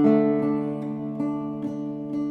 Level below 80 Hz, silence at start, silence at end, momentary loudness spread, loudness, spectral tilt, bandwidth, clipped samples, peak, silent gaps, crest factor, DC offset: -66 dBFS; 0 s; 0 s; 10 LU; -26 LUFS; -10 dB/octave; 4.5 kHz; under 0.1%; -8 dBFS; none; 16 dB; under 0.1%